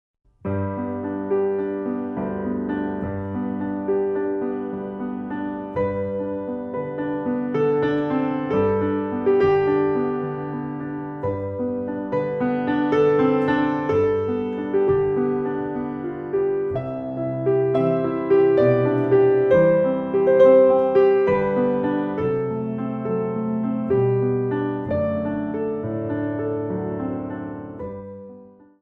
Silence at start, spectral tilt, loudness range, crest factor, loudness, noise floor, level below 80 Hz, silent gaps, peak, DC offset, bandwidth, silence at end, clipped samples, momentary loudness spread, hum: 0.45 s; -10 dB/octave; 9 LU; 18 dB; -22 LUFS; -46 dBFS; -54 dBFS; none; -4 dBFS; under 0.1%; 5.2 kHz; 0.35 s; under 0.1%; 12 LU; none